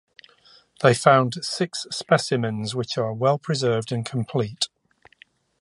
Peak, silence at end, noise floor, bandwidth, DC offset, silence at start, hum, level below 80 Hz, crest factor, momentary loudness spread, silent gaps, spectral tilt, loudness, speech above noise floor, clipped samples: 0 dBFS; 0.95 s; -58 dBFS; 11.5 kHz; under 0.1%; 0.8 s; none; -64 dBFS; 22 dB; 10 LU; none; -5 dB/octave; -23 LUFS; 36 dB; under 0.1%